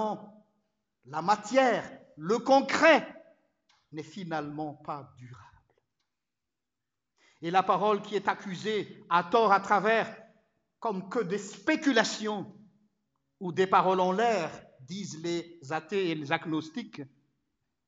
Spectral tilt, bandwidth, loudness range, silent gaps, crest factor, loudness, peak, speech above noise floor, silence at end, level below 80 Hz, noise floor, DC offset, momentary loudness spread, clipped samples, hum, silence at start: -4.5 dB/octave; 8 kHz; 14 LU; none; 22 dB; -28 LUFS; -8 dBFS; 61 dB; 0.8 s; -78 dBFS; -89 dBFS; under 0.1%; 17 LU; under 0.1%; none; 0 s